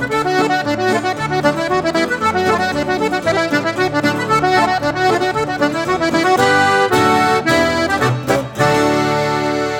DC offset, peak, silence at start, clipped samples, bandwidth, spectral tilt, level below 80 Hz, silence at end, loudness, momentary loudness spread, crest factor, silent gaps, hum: under 0.1%; 0 dBFS; 0 s; under 0.1%; 18 kHz; -4.5 dB/octave; -44 dBFS; 0 s; -15 LUFS; 5 LU; 16 dB; none; none